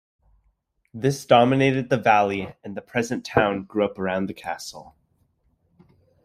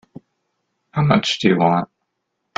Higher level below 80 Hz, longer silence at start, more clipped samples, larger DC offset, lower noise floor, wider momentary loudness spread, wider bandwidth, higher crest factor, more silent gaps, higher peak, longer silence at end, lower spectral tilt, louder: about the same, -58 dBFS vs -54 dBFS; about the same, 0.95 s vs 0.95 s; neither; neither; second, -68 dBFS vs -75 dBFS; first, 16 LU vs 11 LU; first, 15 kHz vs 9 kHz; about the same, 20 dB vs 20 dB; neither; second, -4 dBFS vs 0 dBFS; first, 1.4 s vs 0.75 s; about the same, -5.5 dB/octave vs -6 dB/octave; second, -22 LUFS vs -18 LUFS